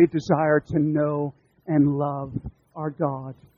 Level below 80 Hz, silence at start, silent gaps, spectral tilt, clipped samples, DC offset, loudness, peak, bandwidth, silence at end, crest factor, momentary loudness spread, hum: -52 dBFS; 0 s; none; -9 dB/octave; under 0.1%; under 0.1%; -24 LUFS; -6 dBFS; 7.2 kHz; 0.25 s; 18 dB; 14 LU; none